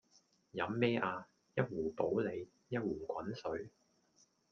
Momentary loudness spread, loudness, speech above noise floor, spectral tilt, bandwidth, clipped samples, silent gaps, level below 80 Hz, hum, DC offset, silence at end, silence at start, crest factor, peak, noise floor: 12 LU; -39 LUFS; 35 dB; -7.5 dB/octave; 7 kHz; under 0.1%; none; -72 dBFS; none; under 0.1%; 0.85 s; 0.55 s; 22 dB; -18 dBFS; -73 dBFS